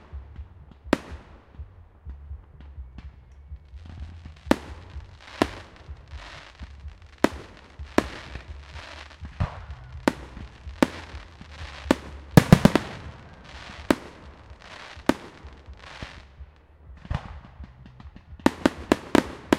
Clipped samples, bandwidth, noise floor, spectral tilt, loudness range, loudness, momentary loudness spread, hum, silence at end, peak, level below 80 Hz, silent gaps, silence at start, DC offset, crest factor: under 0.1%; 16 kHz; -49 dBFS; -6 dB/octave; 13 LU; -25 LUFS; 23 LU; none; 0 s; 0 dBFS; -42 dBFS; none; 0.15 s; under 0.1%; 28 dB